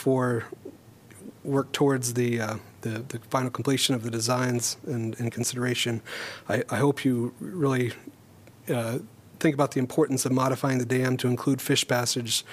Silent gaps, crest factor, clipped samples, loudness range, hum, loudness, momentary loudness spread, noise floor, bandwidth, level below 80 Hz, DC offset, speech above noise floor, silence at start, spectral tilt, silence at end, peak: none; 18 dB; under 0.1%; 3 LU; none; -27 LUFS; 11 LU; -52 dBFS; 15.5 kHz; -68 dBFS; under 0.1%; 26 dB; 0 s; -4.5 dB/octave; 0 s; -8 dBFS